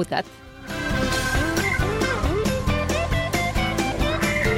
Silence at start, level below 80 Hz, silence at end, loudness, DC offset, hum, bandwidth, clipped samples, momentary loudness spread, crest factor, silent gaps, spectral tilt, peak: 0 s; -32 dBFS; 0 s; -23 LUFS; under 0.1%; none; 16.5 kHz; under 0.1%; 6 LU; 16 dB; none; -4.5 dB/octave; -6 dBFS